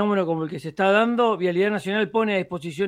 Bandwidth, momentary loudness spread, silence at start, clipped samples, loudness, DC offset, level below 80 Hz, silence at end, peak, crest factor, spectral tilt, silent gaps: 12.5 kHz; 8 LU; 0 s; under 0.1%; -22 LUFS; under 0.1%; -66 dBFS; 0 s; -4 dBFS; 18 dB; -6.5 dB/octave; none